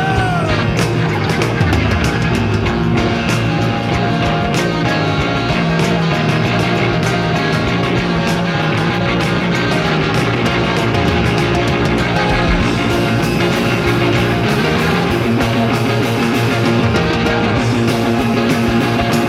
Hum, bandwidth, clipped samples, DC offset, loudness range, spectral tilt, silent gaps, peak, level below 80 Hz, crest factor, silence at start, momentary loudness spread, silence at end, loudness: none; 15.5 kHz; under 0.1%; under 0.1%; 1 LU; -6 dB/octave; none; 0 dBFS; -30 dBFS; 14 dB; 0 s; 2 LU; 0 s; -15 LUFS